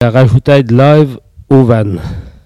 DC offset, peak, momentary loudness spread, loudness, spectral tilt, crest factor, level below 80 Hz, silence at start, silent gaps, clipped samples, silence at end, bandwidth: under 0.1%; 0 dBFS; 11 LU; -9 LUFS; -9 dB/octave; 8 dB; -32 dBFS; 0 s; none; 2%; 0.15 s; 9.6 kHz